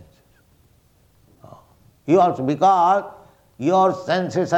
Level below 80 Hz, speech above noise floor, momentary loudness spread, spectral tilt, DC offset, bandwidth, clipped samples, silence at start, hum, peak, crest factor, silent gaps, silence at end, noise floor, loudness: -62 dBFS; 40 dB; 9 LU; -6.5 dB/octave; under 0.1%; 8.6 kHz; under 0.1%; 2.05 s; none; -4 dBFS; 16 dB; none; 0 s; -57 dBFS; -18 LUFS